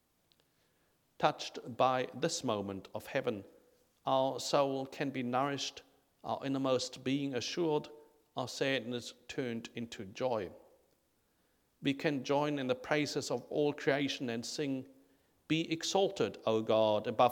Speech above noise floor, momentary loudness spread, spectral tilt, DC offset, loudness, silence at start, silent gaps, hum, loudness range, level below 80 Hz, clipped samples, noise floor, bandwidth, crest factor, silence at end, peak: 41 dB; 11 LU; -4.5 dB/octave; under 0.1%; -35 LUFS; 1.2 s; none; none; 5 LU; -76 dBFS; under 0.1%; -75 dBFS; 18 kHz; 22 dB; 0 s; -14 dBFS